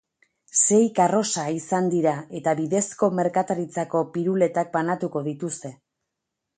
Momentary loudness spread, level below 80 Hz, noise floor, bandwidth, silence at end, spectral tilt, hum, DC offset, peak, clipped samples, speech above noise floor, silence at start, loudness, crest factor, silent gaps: 10 LU; -70 dBFS; -82 dBFS; 9.6 kHz; 0.85 s; -4.5 dB/octave; none; under 0.1%; -6 dBFS; under 0.1%; 60 dB; 0.55 s; -23 LUFS; 18 dB; none